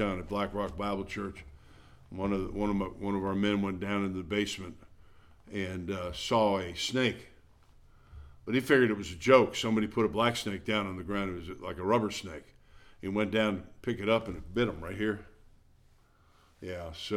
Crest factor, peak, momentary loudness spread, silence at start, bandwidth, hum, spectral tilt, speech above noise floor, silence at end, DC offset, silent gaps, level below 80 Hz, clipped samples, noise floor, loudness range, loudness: 24 dB; -8 dBFS; 15 LU; 0 s; 16 kHz; none; -5.5 dB/octave; 32 dB; 0 s; under 0.1%; none; -52 dBFS; under 0.1%; -63 dBFS; 6 LU; -31 LUFS